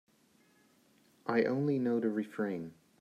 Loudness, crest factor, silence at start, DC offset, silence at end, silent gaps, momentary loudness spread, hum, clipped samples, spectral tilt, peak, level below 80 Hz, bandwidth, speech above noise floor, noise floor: -34 LUFS; 20 dB; 1.25 s; under 0.1%; 0.3 s; none; 12 LU; none; under 0.1%; -8.5 dB/octave; -16 dBFS; -84 dBFS; 13 kHz; 36 dB; -68 dBFS